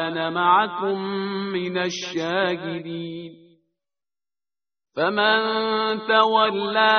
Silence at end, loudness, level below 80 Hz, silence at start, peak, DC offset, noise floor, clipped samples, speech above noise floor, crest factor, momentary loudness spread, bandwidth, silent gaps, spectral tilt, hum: 0 s; -22 LUFS; -68 dBFS; 0 s; -2 dBFS; under 0.1%; under -90 dBFS; under 0.1%; over 68 dB; 20 dB; 13 LU; 6.6 kHz; none; -1.5 dB/octave; none